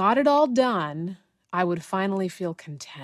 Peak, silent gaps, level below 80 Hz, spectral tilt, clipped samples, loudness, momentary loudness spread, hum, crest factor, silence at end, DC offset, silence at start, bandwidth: -8 dBFS; none; -70 dBFS; -6 dB/octave; under 0.1%; -24 LUFS; 15 LU; none; 16 dB; 0 s; under 0.1%; 0 s; 13.5 kHz